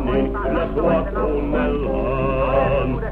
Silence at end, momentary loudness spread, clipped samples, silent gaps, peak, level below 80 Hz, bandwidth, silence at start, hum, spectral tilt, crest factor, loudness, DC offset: 0 s; 3 LU; under 0.1%; none; -6 dBFS; -28 dBFS; 4.4 kHz; 0 s; none; -9.5 dB/octave; 14 dB; -20 LUFS; under 0.1%